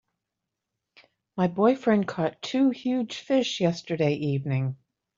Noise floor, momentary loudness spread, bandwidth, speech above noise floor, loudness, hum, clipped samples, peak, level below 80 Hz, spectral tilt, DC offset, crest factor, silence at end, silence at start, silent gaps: -85 dBFS; 7 LU; 7.6 kHz; 60 dB; -26 LUFS; none; under 0.1%; -8 dBFS; -68 dBFS; -6.5 dB/octave; under 0.1%; 18 dB; 0.45 s; 1.35 s; none